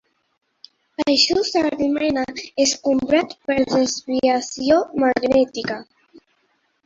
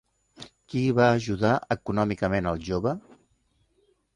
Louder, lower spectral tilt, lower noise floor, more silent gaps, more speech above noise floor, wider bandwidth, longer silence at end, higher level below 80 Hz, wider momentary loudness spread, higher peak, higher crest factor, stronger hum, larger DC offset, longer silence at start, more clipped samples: first, -19 LUFS vs -26 LUFS; second, -3 dB/octave vs -7 dB/octave; about the same, -66 dBFS vs -69 dBFS; neither; about the same, 47 dB vs 44 dB; second, 7.8 kHz vs 11 kHz; second, 1 s vs 1.15 s; about the same, -54 dBFS vs -50 dBFS; second, 9 LU vs 17 LU; first, -4 dBFS vs -8 dBFS; about the same, 18 dB vs 20 dB; neither; neither; first, 1 s vs 0.4 s; neither